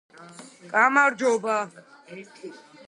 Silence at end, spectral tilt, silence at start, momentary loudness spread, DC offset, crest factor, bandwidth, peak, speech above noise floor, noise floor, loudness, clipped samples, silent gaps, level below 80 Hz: 0.3 s; -3.5 dB/octave; 0.2 s; 25 LU; under 0.1%; 22 dB; 11.5 kHz; -4 dBFS; 22 dB; -46 dBFS; -22 LUFS; under 0.1%; none; -82 dBFS